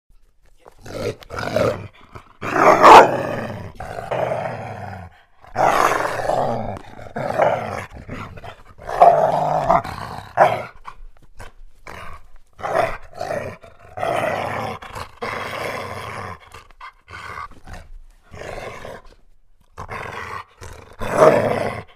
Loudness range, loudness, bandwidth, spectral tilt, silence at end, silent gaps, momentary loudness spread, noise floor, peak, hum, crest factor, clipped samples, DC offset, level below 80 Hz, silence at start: 20 LU; -18 LUFS; 15.5 kHz; -5 dB/octave; 0.1 s; none; 23 LU; -50 dBFS; 0 dBFS; none; 20 dB; under 0.1%; under 0.1%; -42 dBFS; 0.85 s